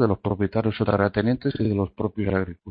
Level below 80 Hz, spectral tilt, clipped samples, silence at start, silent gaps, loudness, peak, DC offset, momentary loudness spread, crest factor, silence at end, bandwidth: -48 dBFS; -12 dB/octave; under 0.1%; 0 s; none; -24 LUFS; -6 dBFS; under 0.1%; 5 LU; 18 dB; 0 s; 5 kHz